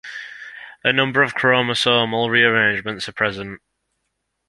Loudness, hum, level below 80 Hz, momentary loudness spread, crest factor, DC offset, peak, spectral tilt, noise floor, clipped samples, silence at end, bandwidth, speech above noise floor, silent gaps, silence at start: -17 LUFS; none; -58 dBFS; 19 LU; 20 dB; under 0.1%; -2 dBFS; -4.5 dB/octave; -75 dBFS; under 0.1%; 0.9 s; 11.5 kHz; 56 dB; none; 0.05 s